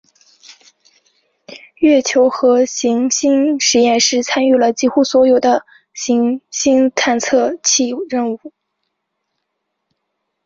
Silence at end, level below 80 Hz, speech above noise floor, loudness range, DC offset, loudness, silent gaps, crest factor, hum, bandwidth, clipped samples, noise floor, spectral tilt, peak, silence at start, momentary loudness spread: 1.95 s; -60 dBFS; 60 dB; 4 LU; under 0.1%; -14 LUFS; none; 14 dB; none; 7.6 kHz; under 0.1%; -74 dBFS; -2 dB/octave; -2 dBFS; 1.5 s; 8 LU